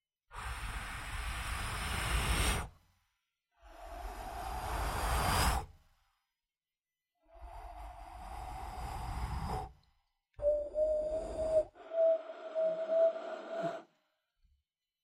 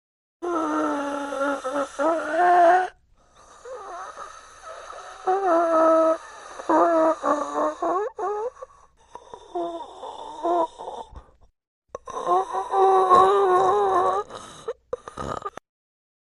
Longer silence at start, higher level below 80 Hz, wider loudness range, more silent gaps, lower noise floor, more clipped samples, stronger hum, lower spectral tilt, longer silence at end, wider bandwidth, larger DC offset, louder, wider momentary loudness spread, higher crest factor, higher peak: about the same, 0.3 s vs 0.4 s; first, -44 dBFS vs -58 dBFS; about the same, 11 LU vs 9 LU; second, none vs 11.67-11.82 s; first, under -90 dBFS vs -56 dBFS; neither; neither; about the same, -4 dB/octave vs -4.5 dB/octave; first, 1.2 s vs 0.75 s; first, 16 kHz vs 11.5 kHz; neither; second, -36 LUFS vs -22 LUFS; about the same, 19 LU vs 21 LU; about the same, 20 dB vs 20 dB; second, -18 dBFS vs -4 dBFS